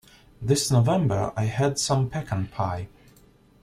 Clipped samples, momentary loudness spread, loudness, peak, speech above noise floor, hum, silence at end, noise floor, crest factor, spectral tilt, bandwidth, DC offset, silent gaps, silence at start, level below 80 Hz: under 0.1%; 11 LU; -25 LUFS; -8 dBFS; 32 dB; none; 0.75 s; -56 dBFS; 18 dB; -5.5 dB/octave; 15 kHz; under 0.1%; none; 0.4 s; -52 dBFS